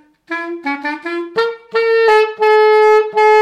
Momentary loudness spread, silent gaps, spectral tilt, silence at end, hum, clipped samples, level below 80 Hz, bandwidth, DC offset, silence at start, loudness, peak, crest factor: 13 LU; none; -3 dB/octave; 0 s; none; under 0.1%; -66 dBFS; 9.2 kHz; under 0.1%; 0.3 s; -13 LUFS; -2 dBFS; 10 dB